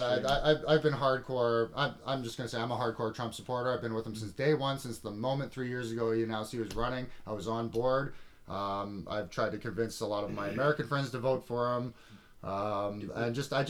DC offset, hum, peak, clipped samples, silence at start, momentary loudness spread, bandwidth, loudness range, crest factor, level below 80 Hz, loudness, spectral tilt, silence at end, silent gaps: under 0.1%; none; -14 dBFS; under 0.1%; 0 s; 9 LU; 16.5 kHz; 3 LU; 20 dB; -54 dBFS; -33 LUFS; -6 dB/octave; 0 s; none